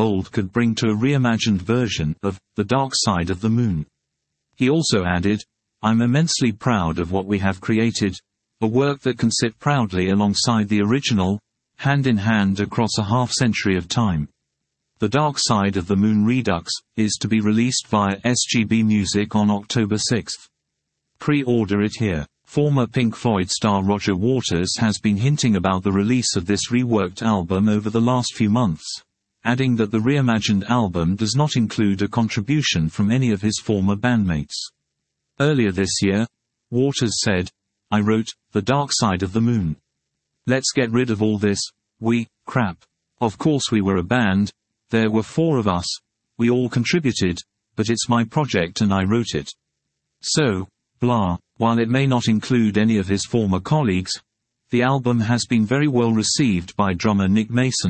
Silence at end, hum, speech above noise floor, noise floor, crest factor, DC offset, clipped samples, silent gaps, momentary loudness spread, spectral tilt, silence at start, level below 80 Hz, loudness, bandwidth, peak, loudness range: 0 s; none; 58 dB; -78 dBFS; 16 dB; under 0.1%; under 0.1%; none; 7 LU; -5 dB/octave; 0 s; -52 dBFS; -20 LUFS; 8.8 kHz; -4 dBFS; 2 LU